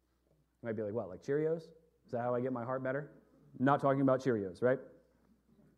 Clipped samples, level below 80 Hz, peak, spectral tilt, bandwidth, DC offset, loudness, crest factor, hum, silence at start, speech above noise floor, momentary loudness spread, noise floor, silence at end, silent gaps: under 0.1%; -76 dBFS; -14 dBFS; -8.5 dB/octave; 9.8 kHz; under 0.1%; -35 LUFS; 22 dB; none; 0.65 s; 40 dB; 12 LU; -74 dBFS; 0.85 s; none